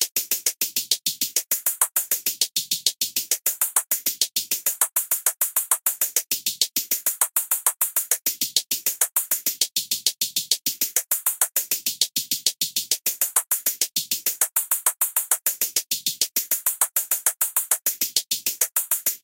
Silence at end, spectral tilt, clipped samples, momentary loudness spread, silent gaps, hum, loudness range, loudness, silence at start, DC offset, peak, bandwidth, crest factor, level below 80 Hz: 0.05 s; 2.5 dB/octave; under 0.1%; 3 LU; 0.11-0.15 s; none; 1 LU; -21 LUFS; 0 s; under 0.1%; -2 dBFS; 17.5 kHz; 22 dB; -82 dBFS